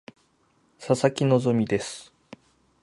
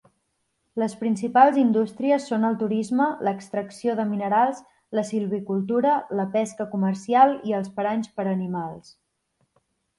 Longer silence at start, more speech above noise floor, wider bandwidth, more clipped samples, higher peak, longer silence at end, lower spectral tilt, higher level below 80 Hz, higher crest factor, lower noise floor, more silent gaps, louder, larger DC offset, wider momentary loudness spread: about the same, 0.8 s vs 0.75 s; second, 42 dB vs 51 dB; about the same, 11.5 kHz vs 11.5 kHz; neither; about the same, -6 dBFS vs -4 dBFS; second, 0.8 s vs 1.2 s; about the same, -6 dB/octave vs -7 dB/octave; first, -62 dBFS vs -70 dBFS; about the same, 22 dB vs 20 dB; second, -65 dBFS vs -74 dBFS; neither; about the same, -24 LUFS vs -23 LUFS; neither; first, 18 LU vs 11 LU